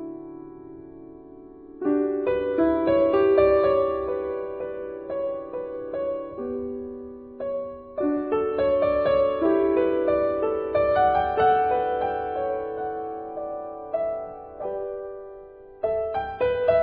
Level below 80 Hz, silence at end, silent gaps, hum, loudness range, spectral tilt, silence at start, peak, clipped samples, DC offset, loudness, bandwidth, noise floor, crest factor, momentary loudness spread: -50 dBFS; 0 s; none; none; 9 LU; -10 dB/octave; 0 s; -6 dBFS; under 0.1%; under 0.1%; -25 LUFS; 4.9 kHz; -44 dBFS; 18 dB; 19 LU